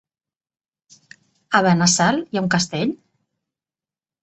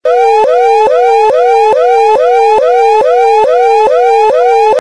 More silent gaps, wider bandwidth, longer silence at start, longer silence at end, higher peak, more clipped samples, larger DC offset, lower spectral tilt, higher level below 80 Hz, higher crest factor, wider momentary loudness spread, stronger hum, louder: neither; second, 8.4 kHz vs 11 kHz; first, 1.5 s vs 0.05 s; first, 1.3 s vs 0 s; about the same, -2 dBFS vs 0 dBFS; second, under 0.1% vs 0.2%; second, under 0.1% vs 1%; first, -4 dB/octave vs -2.5 dB/octave; second, -60 dBFS vs -50 dBFS; first, 22 dB vs 6 dB; first, 10 LU vs 0 LU; neither; second, -18 LUFS vs -7 LUFS